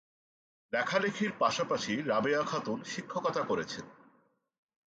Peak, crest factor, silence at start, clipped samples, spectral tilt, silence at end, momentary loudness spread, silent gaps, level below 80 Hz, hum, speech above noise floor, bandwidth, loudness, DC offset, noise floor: -14 dBFS; 20 dB; 0.7 s; under 0.1%; -4 dB/octave; 1 s; 8 LU; none; -74 dBFS; none; 38 dB; 9 kHz; -32 LUFS; under 0.1%; -70 dBFS